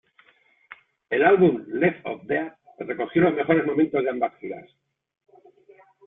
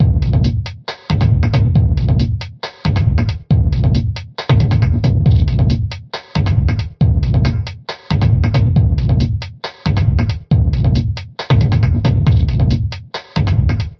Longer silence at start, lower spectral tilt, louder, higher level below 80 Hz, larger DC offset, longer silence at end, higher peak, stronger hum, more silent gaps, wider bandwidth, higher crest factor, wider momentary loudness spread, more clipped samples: first, 1.1 s vs 0 s; first, -10.5 dB/octave vs -8 dB/octave; second, -23 LUFS vs -15 LUFS; second, -66 dBFS vs -22 dBFS; neither; first, 1.45 s vs 0.05 s; second, -6 dBFS vs -2 dBFS; neither; neither; second, 3.9 kHz vs 6.4 kHz; first, 18 dB vs 12 dB; first, 18 LU vs 10 LU; neither